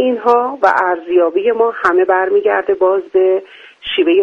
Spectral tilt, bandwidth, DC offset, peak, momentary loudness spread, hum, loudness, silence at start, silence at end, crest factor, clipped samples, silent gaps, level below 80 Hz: -5 dB/octave; 6.6 kHz; under 0.1%; 0 dBFS; 3 LU; none; -14 LUFS; 0 s; 0 s; 14 dB; under 0.1%; none; -58 dBFS